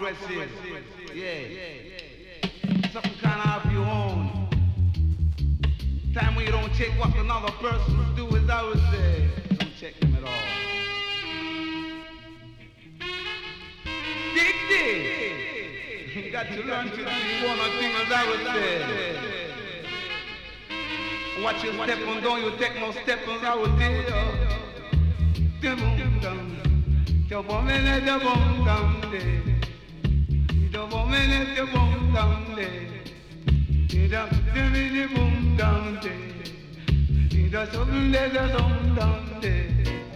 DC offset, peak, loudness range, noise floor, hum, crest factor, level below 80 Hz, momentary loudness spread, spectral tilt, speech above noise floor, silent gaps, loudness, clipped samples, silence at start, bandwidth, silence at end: under 0.1%; -8 dBFS; 5 LU; -47 dBFS; none; 16 dB; -28 dBFS; 12 LU; -6.5 dB/octave; 23 dB; none; -25 LUFS; under 0.1%; 0 s; 8.4 kHz; 0 s